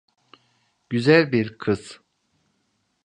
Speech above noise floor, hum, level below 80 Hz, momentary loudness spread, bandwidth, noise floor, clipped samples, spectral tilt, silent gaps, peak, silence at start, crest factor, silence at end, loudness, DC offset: 51 dB; none; -60 dBFS; 12 LU; 9.8 kHz; -71 dBFS; under 0.1%; -6.5 dB/octave; none; -2 dBFS; 0.9 s; 22 dB; 1.1 s; -21 LUFS; under 0.1%